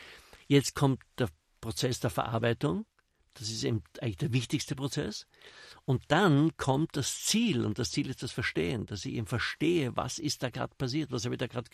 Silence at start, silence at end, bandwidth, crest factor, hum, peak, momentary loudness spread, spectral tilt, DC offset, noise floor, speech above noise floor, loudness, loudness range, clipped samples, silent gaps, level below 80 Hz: 0 s; 0.1 s; 13.5 kHz; 20 dB; none; -12 dBFS; 11 LU; -5 dB/octave; under 0.1%; -53 dBFS; 22 dB; -31 LUFS; 4 LU; under 0.1%; none; -60 dBFS